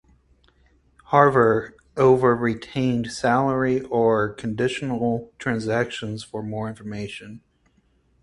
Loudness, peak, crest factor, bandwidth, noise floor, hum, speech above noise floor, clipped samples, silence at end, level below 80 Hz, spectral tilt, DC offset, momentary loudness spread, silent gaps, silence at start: -22 LUFS; 0 dBFS; 22 dB; 11.5 kHz; -63 dBFS; none; 42 dB; under 0.1%; 0.85 s; -54 dBFS; -6.5 dB/octave; under 0.1%; 15 LU; none; 1.1 s